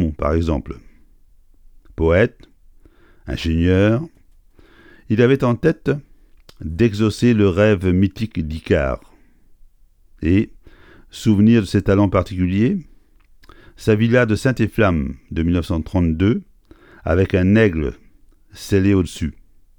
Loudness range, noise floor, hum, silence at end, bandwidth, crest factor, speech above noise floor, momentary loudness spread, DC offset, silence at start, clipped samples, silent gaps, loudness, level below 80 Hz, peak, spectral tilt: 4 LU; -50 dBFS; none; 0.5 s; 17 kHz; 18 dB; 34 dB; 13 LU; under 0.1%; 0 s; under 0.1%; none; -18 LUFS; -34 dBFS; -2 dBFS; -7.5 dB/octave